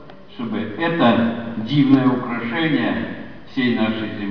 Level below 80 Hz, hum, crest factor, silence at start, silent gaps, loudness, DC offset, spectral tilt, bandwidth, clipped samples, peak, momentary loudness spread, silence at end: -54 dBFS; none; 20 dB; 0 s; none; -19 LUFS; 1%; -8.5 dB/octave; 5.4 kHz; under 0.1%; 0 dBFS; 14 LU; 0 s